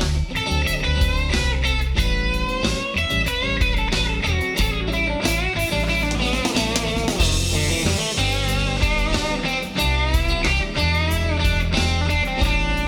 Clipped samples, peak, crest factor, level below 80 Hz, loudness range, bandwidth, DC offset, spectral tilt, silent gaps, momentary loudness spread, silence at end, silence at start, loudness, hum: under 0.1%; -6 dBFS; 16 dB; -24 dBFS; 1 LU; 19 kHz; under 0.1%; -4 dB/octave; none; 2 LU; 0 s; 0 s; -21 LUFS; none